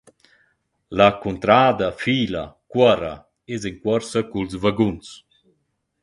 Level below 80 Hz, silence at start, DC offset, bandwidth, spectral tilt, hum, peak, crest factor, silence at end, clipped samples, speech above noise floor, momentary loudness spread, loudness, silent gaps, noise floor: -50 dBFS; 0.9 s; under 0.1%; 11.5 kHz; -6 dB/octave; none; 0 dBFS; 20 dB; 0.85 s; under 0.1%; 51 dB; 15 LU; -20 LUFS; none; -71 dBFS